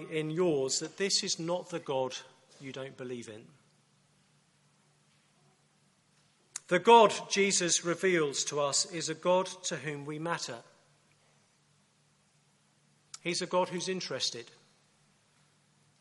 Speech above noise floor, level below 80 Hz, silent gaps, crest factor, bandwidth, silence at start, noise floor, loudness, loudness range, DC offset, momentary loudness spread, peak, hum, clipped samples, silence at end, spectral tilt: 39 dB; -82 dBFS; none; 24 dB; 11.5 kHz; 0 s; -69 dBFS; -30 LUFS; 17 LU; under 0.1%; 18 LU; -10 dBFS; none; under 0.1%; 1.55 s; -3 dB/octave